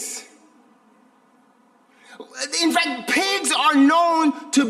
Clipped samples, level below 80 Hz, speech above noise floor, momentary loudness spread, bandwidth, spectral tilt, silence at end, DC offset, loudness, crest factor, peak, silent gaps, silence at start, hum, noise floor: under 0.1%; -74 dBFS; 38 dB; 15 LU; 15 kHz; -1 dB/octave; 0 s; under 0.1%; -19 LUFS; 16 dB; -6 dBFS; none; 0 s; none; -57 dBFS